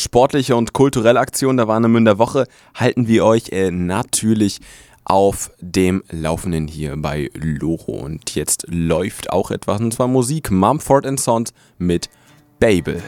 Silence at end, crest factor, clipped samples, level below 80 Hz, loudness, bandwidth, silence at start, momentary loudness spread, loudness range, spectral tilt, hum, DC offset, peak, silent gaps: 0 s; 18 dB; under 0.1%; -40 dBFS; -17 LUFS; 18 kHz; 0 s; 10 LU; 6 LU; -5.5 dB/octave; none; under 0.1%; 0 dBFS; none